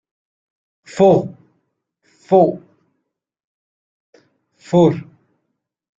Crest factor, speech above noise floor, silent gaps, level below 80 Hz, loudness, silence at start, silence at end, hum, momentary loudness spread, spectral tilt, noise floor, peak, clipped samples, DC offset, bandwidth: 18 dB; 63 dB; 3.44-4.13 s; -58 dBFS; -15 LUFS; 0.95 s; 0.95 s; none; 19 LU; -8 dB/octave; -76 dBFS; -2 dBFS; under 0.1%; under 0.1%; 7.8 kHz